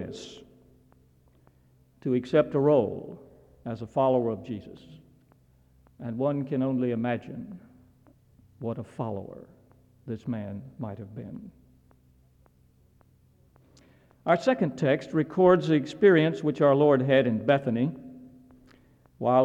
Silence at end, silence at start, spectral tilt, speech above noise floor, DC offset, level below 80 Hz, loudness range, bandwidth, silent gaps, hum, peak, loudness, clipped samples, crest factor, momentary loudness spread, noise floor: 0 s; 0 s; -8 dB/octave; 36 dB; under 0.1%; -64 dBFS; 17 LU; 8.6 kHz; none; none; -8 dBFS; -26 LUFS; under 0.1%; 20 dB; 21 LU; -61 dBFS